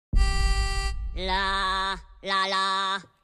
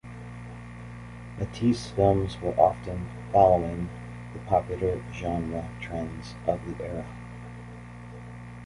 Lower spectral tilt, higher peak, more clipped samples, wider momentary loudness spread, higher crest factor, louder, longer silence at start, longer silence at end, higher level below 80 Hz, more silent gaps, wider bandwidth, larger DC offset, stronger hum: second, -3.5 dB/octave vs -7.5 dB/octave; second, -10 dBFS vs -6 dBFS; neither; second, 7 LU vs 19 LU; second, 16 dB vs 24 dB; about the same, -26 LUFS vs -27 LUFS; about the same, 0.15 s vs 0.05 s; first, 0.2 s vs 0 s; first, -28 dBFS vs -44 dBFS; neither; about the same, 12 kHz vs 11.5 kHz; neither; second, none vs 60 Hz at -50 dBFS